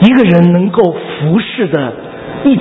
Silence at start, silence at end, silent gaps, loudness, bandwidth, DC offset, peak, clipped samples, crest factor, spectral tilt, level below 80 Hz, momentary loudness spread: 0 s; 0 s; none; -11 LUFS; 4 kHz; under 0.1%; 0 dBFS; 0.4%; 10 dB; -9.5 dB/octave; -44 dBFS; 13 LU